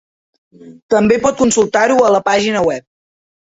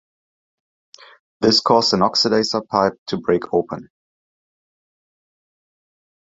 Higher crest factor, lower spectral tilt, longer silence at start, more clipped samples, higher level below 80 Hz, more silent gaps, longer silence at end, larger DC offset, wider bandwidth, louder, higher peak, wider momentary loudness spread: second, 14 dB vs 20 dB; about the same, -4 dB/octave vs -4.5 dB/octave; second, 0.65 s vs 1.4 s; neither; first, -48 dBFS vs -56 dBFS; about the same, 0.82-0.89 s vs 2.98-3.06 s; second, 0.8 s vs 2.45 s; neither; about the same, 8.2 kHz vs 8 kHz; first, -13 LUFS vs -18 LUFS; about the same, -2 dBFS vs -2 dBFS; second, 6 LU vs 9 LU